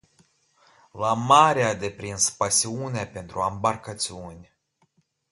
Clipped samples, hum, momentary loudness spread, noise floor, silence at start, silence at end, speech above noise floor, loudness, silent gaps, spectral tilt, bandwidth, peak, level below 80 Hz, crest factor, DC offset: under 0.1%; none; 15 LU; -68 dBFS; 0.95 s; 0.9 s; 44 dB; -23 LUFS; none; -3 dB/octave; 12 kHz; -2 dBFS; -56 dBFS; 24 dB; under 0.1%